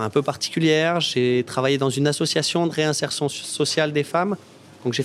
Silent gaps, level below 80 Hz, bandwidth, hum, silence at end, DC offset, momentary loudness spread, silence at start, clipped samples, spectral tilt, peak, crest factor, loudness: none; -68 dBFS; 15 kHz; none; 0 s; under 0.1%; 6 LU; 0 s; under 0.1%; -4.5 dB/octave; -4 dBFS; 16 dB; -21 LUFS